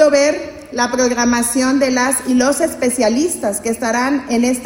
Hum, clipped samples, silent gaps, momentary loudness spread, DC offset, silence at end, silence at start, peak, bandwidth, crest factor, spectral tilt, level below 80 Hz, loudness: none; under 0.1%; none; 5 LU; under 0.1%; 0 s; 0 s; 0 dBFS; 17 kHz; 14 dB; -2.5 dB/octave; -48 dBFS; -15 LUFS